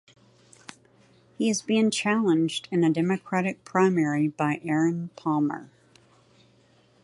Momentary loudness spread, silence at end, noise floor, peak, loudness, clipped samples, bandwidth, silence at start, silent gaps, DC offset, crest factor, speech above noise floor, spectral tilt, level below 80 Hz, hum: 6 LU; 1.35 s; -60 dBFS; -8 dBFS; -25 LUFS; under 0.1%; 11.5 kHz; 1.4 s; none; under 0.1%; 18 dB; 36 dB; -5.5 dB/octave; -74 dBFS; none